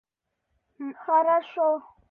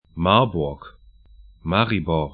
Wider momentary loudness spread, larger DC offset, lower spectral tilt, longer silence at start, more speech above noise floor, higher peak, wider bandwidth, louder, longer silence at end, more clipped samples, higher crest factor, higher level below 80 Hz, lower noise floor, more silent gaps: about the same, 17 LU vs 15 LU; neither; second, -6.5 dB/octave vs -11 dB/octave; first, 0.8 s vs 0.15 s; first, 55 dB vs 28 dB; second, -12 dBFS vs 0 dBFS; second, 4.1 kHz vs 4.9 kHz; second, -24 LUFS vs -21 LUFS; first, 0.3 s vs 0.05 s; neither; second, 16 dB vs 22 dB; second, -76 dBFS vs -42 dBFS; first, -80 dBFS vs -49 dBFS; neither